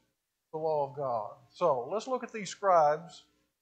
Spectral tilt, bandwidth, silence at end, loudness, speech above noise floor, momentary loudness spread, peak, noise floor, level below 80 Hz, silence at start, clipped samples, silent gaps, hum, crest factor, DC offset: -5 dB/octave; 9 kHz; 0.45 s; -31 LUFS; 50 dB; 15 LU; -14 dBFS; -81 dBFS; -82 dBFS; 0.55 s; under 0.1%; none; none; 18 dB; under 0.1%